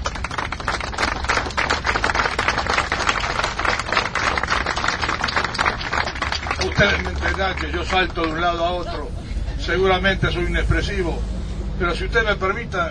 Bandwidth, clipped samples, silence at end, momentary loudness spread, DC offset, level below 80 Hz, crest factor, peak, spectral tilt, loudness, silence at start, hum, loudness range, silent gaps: 10.5 kHz; under 0.1%; 0 s; 8 LU; under 0.1%; -30 dBFS; 20 dB; 0 dBFS; -4 dB/octave; -21 LUFS; 0 s; none; 2 LU; none